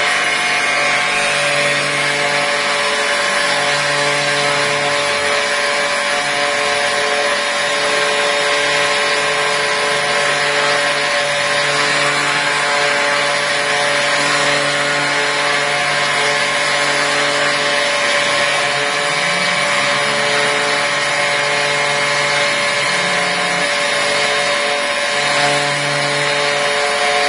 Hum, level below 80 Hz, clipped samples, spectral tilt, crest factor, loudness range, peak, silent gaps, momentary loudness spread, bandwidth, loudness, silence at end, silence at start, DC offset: none; -58 dBFS; under 0.1%; -1.5 dB/octave; 14 dB; 1 LU; -2 dBFS; none; 1 LU; 11 kHz; -14 LUFS; 0 s; 0 s; under 0.1%